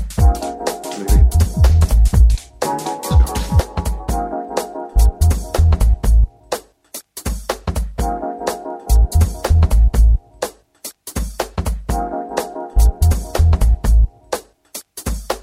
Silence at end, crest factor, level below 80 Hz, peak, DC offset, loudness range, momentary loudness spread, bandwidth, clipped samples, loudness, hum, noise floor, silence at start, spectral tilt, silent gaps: 0 s; 14 dB; -16 dBFS; -2 dBFS; under 0.1%; 5 LU; 13 LU; 16 kHz; under 0.1%; -18 LUFS; none; -37 dBFS; 0 s; -6 dB/octave; none